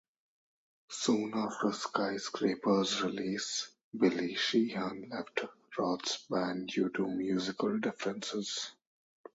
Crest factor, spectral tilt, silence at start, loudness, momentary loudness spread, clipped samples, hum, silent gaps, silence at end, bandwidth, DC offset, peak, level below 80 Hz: 22 dB; -4 dB/octave; 0.9 s; -34 LUFS; 8 LU; under 0.1%; none; 3.84-3.92 s; 0.65 s; 8 kHz; under 0.1%; -12 dBFS; -76 dBFS